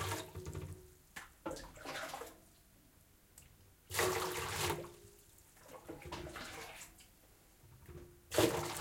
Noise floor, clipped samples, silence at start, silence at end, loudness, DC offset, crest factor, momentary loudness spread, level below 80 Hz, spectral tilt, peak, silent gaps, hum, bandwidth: -66 dBFS; under 0.1%; 0 s; 0 s; -40 LUFS; under 0.1%; 26 dB; 26 LU; -64 dBFS; -3.5 dB/octave; -18 dBFS; none; none; 16.5 kHz